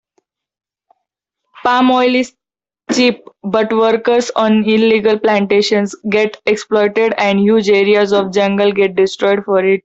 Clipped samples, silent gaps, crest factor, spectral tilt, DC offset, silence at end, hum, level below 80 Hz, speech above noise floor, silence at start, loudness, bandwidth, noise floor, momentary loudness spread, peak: under 0.1%; none; 12 dB; -5 dB/octave; under 0.1%; 0.05 s; none; -58 dBFS; 73 dB; 1.65 s; -13 LUFS; 8 kHz; -85 dBFS; 5 LU; -2 dBFS